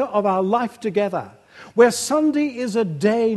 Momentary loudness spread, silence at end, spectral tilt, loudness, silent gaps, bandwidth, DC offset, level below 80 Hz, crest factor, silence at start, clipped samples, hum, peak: 9 LU; 0 s; -5 dB/octave; -20 LUFS; none; 12.5 kHz; under 0.1%; -70 dBFS; 18 dB; 0 s; under 0.1%; none; -2 dBFS